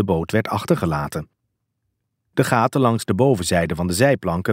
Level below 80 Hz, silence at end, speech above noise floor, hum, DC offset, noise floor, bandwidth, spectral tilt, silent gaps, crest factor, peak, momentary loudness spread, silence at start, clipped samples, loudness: -44 dBFS; 0 s; 56 dB; none; under 0.1%; -75 dBFS; 16 kHz; -6 dB/octave; none; 20 dB; -2 dBFS; 7 LU; 0 s; under 0.1%; -20 LUFS